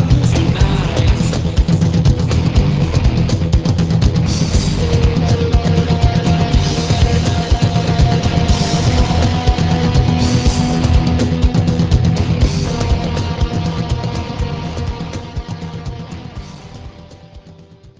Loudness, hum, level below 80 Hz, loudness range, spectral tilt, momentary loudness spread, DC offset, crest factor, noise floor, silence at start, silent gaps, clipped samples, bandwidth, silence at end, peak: -15 LUFS; none; -20 dBFS; 8 LU; -6.5 dB/octave; 12 LU; under 0.1%; 14 dB; -40 dBFS; 0 s; none; under 0.1%; 8 kHz; 0.1 s; 0 dBFS